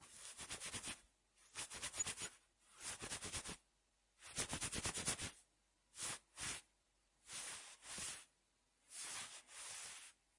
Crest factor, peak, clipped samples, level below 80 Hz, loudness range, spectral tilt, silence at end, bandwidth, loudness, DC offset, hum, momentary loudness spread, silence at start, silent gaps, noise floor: 26 dB; -26 dBFS; under 0.1%; -70 dBFS; 4 LU; -1 dB/octave; 0.25 s; 12 kHz; -47 LUFS; under 0.1%; none; 13 LU; 0 s; none; -81 dBFS